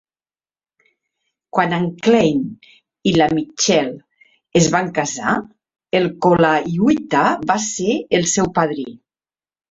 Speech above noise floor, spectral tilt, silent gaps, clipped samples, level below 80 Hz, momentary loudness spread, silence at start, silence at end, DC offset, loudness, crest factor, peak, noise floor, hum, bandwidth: over 73 dB; -4.5 dB/octave; none; under 0.1%; -52 dBFS; 8 LU; 1.55 s; 0.75 s; under 0.1%; -17 LUFS; 18 dB; 0 dBFS; under -90 dBFS; none; 8.4 kHz